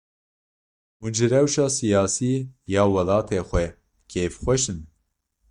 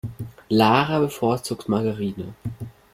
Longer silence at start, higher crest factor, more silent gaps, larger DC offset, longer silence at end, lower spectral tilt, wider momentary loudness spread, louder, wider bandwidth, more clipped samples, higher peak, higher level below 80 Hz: first, 1 s vs 0.05 s; about the same, 18 dB vs 22 dB; neither; neither; first, 0.65 s vs 0.25 s; about the same, -5 dB/octave vs -6 dB/octave; second, 9 LU vs 17 LU; about the same, -23 LUFS vs -22 LUFS; second, 11.5 kHz vs 16.5 kHz; neither; second, -6 dBFS vs -2 dBFS; first, -42 dBFS vs -54 dBFS